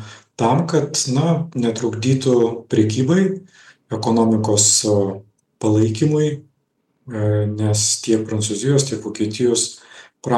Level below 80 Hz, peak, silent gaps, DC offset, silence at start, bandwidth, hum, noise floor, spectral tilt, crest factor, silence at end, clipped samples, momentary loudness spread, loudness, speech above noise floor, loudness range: -60 dBFS; -2 dBFS; none; under 0.1%; 0 s; 12.5 kHz; none; -68 dBFS; -5 dB/octave; 16 dB; 0 s; under 0.1%; 9 LU; -18 LUFS; 50 dB; 3 LU